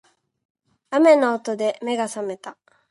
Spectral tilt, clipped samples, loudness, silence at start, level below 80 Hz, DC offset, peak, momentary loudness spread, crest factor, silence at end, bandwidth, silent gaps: -4 dB/octave; under 0.1%; -20 LUFS; 0.9 s; -78 dBFS; under 0.1%; -4 dBFS; 17 LU; 18 dB; 0.4 s; 11.5 kHz; none